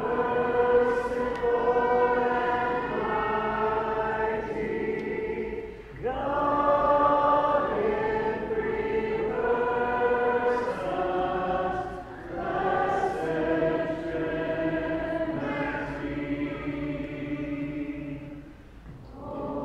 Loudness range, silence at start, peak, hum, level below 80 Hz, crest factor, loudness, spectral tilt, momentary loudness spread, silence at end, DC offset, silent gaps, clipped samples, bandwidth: 6 LU; 0 s; -10 dBFS; none; -48 dBFS; 16 dB; -27 LUFS; -7.5 dB/octave; 11 LU; 0 s; under 0.1%; none; under 0.1%; 9 kHz